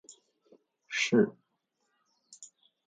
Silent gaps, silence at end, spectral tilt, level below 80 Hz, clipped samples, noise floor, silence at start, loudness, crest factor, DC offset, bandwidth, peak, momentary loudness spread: none; 0.45 s; -4.5 dB/octave; -84 dBFS; under 0.1%; -80 dBFS; 0.9 s; -29 LUFS; 22 dB; under 0.1%; 9.4 kHz; -12 dBFS; 25 LU